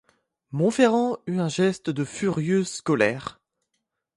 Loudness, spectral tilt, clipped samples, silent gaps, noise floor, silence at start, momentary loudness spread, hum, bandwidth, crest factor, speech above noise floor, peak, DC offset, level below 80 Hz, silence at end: -24 LUFS; -6 dB/octave; under 0.1%; none; -79 dBFS; 0.5 s; 9 LU; none; 11.5 kHz; 20 dB; 56 dB; -6 dBFS; under 0.1%; -64 dBFS; 0.85 s